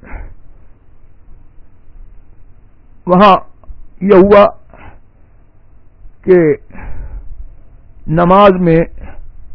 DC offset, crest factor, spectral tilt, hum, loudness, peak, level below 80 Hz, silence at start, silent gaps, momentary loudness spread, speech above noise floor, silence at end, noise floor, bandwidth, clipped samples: under 0.1%; 14 dB; -9.5 dB/octave; none; -9 LUFS; 0 dBFS; -32 dBFS; 0.1 s; none; 26 LU; 35 dB; 0 s; -42 dBFS; 5.4 kHz; 0.8%